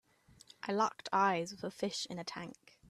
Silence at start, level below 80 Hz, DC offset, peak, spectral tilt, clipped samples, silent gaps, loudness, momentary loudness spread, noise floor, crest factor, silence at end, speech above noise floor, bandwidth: 0.65 s; -78 dBFS; under 0.1%; -18 dBFS; -4 dB/octave; under 0.1%; none; -36 LUFS; 15 LU; -62 dBFS; 20 dB; 0.05 s; 26 dB; 14 kHz